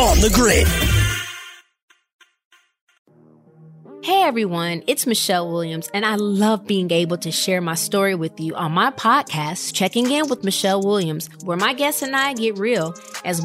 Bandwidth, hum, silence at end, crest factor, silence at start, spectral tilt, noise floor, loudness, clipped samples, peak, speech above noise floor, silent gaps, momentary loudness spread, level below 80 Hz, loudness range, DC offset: 16.5 kHz; none; 0 s; 16 dB; 0 s; -4 dB/octave; -51 dBFS; -19 LUFS; under 0.1%; -4 dBFS; 32 dB; 1.82-1.88 s, 2.14-2.19 s, 2.45-2.51 s, 2.81-2.87 s, 2.99-3.05 s; 9 LU; -32 dBFS; 5 LU; under 0.1%